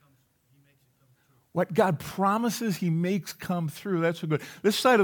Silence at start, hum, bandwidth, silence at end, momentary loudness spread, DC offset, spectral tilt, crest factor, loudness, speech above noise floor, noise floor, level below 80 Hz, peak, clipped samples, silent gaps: 1.55 s; none; over 20 kHz; 0 s; 7 LU; under 0.1%; -5.5 dB/octave; 18 dB; -27 LUFS; 40 dB; -66 dBFS; -70 dBFS; -10 dBFS; under 0.1%; none